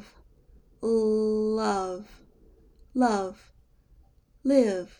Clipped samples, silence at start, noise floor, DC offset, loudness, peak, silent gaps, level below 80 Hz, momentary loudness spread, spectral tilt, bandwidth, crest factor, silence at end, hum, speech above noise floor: under 0.1%; 0.8 s; -59 dBFS; under 0.1%; -26 LUFS; -10 dBFS; none; -56 dBFS; 12 LU; -6 dB/octave; 11 kHz; 18 dB; 0.1 s; none; 34 dB